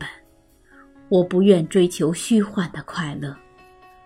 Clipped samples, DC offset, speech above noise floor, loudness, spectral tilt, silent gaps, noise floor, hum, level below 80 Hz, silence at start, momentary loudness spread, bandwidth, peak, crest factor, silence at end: under 0.1%; under 0.1%; 36 dB; -20 LUFS; -6 dB/octave; none; -55 dBFS; none; -56 dBFS; 0 s; 15 LU; 14.5 kHz; -2 dBFS; 20 dB; 0.7 s